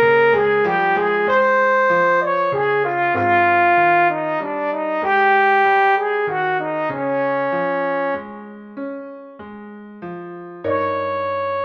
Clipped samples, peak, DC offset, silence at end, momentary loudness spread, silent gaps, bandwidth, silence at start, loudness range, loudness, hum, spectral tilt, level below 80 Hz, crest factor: under 0.1%; -6 dBFS; under 0.1%; 0 s; 19 LU; none; 6.6 kHz; 0 s; 10 LU; -17 LUFS; none; -6.5 dB/octave; -64 dBFS; 12 dB